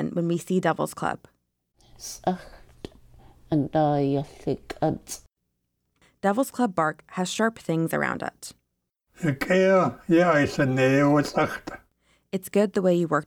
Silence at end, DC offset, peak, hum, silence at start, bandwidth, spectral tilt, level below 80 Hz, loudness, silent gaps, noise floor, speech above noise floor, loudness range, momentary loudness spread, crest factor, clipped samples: 0 s; under 0.1%; -10 dBFS; none; 0 s; 19 kHz; -6 dB/octave; -56 dBFS; -24 LUFS; none; -79 dBFS; 55 dB; 7 LU; 18 LU; 16 dB; under 0.1%